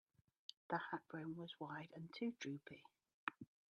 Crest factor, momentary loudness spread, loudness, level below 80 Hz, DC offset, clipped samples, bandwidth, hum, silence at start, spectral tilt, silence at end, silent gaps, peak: 26 dB; 14 LU; -50 LUFS; under -90 dBFS; under 0.1%; under 0.1%; 10.5 kHz; none; 0.5 s; -5.5 dB/octave; 0.25 s; 0.57-0.69 s, 3.14-3.27 s; -24 dBFS